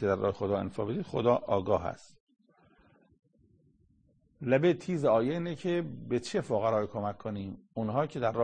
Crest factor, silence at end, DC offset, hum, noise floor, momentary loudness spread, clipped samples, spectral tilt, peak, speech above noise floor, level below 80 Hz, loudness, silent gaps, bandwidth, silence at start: 20 dB; 0 s; under 0.1%; none; -68 dBFS; 11 LU; under 0.1%; -7 dB/octave; -12 dBFS; 37 dB; -62 dBFS; -31 LUFS; 2.20-2.27 s; 9.6 kHz; 0 s